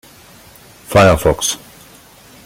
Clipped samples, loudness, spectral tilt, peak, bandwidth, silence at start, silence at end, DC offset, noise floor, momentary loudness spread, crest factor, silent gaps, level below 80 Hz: under 0.1%; -13 LUFS; -4.5 dB/octave; 0 dBFS; 17 kHz; 0.9 s; 0.9 s; under 0.1%; -43 dBFS; 10 LU; 18 dB; none; -36 dBFS